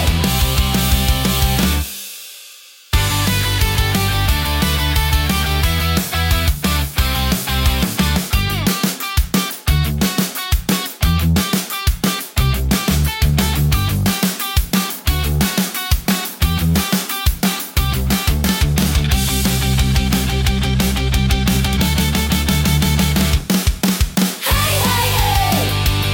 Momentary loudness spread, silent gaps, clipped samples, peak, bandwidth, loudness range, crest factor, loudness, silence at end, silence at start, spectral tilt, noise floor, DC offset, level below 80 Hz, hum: 3 LU; none; under 0.1%; -2 dBFS; 17 kHz; 2 LU; 14 dB; -17 LUFS; 0 s; 0 s; -4 dB/octave; -41 dBFS; under 0.1%; -22 dBFS; none